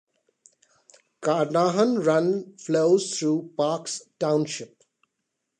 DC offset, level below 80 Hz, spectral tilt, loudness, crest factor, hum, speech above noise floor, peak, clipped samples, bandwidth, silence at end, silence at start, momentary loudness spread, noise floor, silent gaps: under 0.1%; -76 dBFS; -5 dB/octave; -24 LUFS; 16 dB; none; 57 dB; -8 dBFS; under 0.1%; 10 kHz; 0.95 s; 1.2 s; 10 LU; -80 dBFS; none